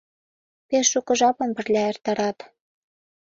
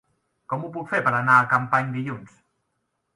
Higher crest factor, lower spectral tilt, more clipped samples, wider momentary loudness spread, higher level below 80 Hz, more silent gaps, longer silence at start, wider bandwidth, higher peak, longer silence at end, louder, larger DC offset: about the same, 18 dB vs 22 dB; second, -2.5 dB/octave vs -7 dB/octave; neither; second, 7 LU vs 15 LU; about the same, -68 dBFS vs -66 dBFS; neither; first, 0.7 s vs 0.5 s; second, 8 kHz vs 11.5 kHz; about the same, -6 dBFS vs -4 dBFS; about the same, 0.9 s vs 0.9 s; about the same, -22 LUFS vs -22 LUFS; neither